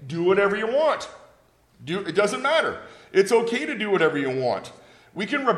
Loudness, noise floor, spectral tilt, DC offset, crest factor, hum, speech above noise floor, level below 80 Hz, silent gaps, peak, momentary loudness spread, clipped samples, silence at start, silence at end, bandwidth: -23 LUFS; -58 dBFS; -5 dB/octave; under 0.1%; 18 dB; none; 36 dB; -66 dBFS; none; -6 dBFS; 14 LU; under 0.1%; 0 s; 0 s; 13 kHz